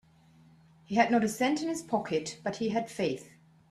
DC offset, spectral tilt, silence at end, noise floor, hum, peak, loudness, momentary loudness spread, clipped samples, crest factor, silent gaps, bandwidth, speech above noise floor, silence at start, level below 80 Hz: under 0.1%; -4.5 dB/octave; 0.45 s; -60 dBFS; none; -10 dBFS; -30 LUFS; 8 LU; under 0.1%; 22 dB; none; 13.5 kHz; 30 dB; 0.9 s; -70 dBFS